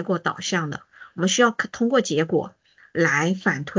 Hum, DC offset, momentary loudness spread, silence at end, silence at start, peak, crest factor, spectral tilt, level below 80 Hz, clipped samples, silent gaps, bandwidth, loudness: none; under 0.1%; 13 LU; 0 s; 0 s; -6 dBFS; 18 dB; -4 dB/octave; -66 dBFS; under 0.1%; none; 7.6 kHz; -22 LUFS